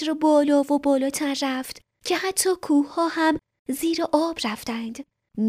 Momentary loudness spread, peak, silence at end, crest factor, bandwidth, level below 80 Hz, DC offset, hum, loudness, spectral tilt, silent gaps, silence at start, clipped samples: 13 LU; -8 dBFS; 0 s; 16 dB; 15.5 kHz; -60 dBFS; under 0.1%; none; -23 LUFS; -3 dB/octave; 3.59-3.65 s; 0 s; under 0.1%